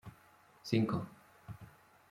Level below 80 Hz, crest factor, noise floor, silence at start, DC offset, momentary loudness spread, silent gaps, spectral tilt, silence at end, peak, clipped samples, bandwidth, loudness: -70 dBFS; 24 dB; -64 dBFS; 0.05 s; under 0.1%; 24 LU; none; -7 dB/octave; 0.4 s; -16 dBFS; under 0.1%; 16 kHz; -35 LUFS